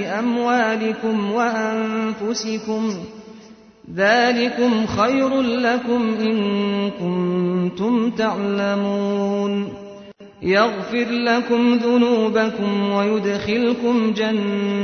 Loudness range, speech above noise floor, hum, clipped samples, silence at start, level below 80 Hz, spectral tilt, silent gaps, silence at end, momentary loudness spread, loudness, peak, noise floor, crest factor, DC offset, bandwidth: 3 LU; 25 dB; none; under 0.1%; 0 s; -56 dBFS; -5.5 dB/octave; none; 0 s; 7 LU; -20 LUFS; -4 dBFS; -44 dBFS; 16 dB; under 0.1%; 6.6 kHz